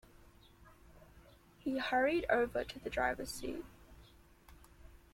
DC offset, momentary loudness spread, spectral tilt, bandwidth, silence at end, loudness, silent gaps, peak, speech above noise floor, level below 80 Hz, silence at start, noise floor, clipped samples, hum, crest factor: under 0.1%; 12 LU; -4 dB/octave; 16.5 kHz; 0.15 s; -36 LUFS; none; -18 dBFS; 26 dB; -58 dBFS; 0.65 s; -62 dBFS; under 0.1%; none; 20 dB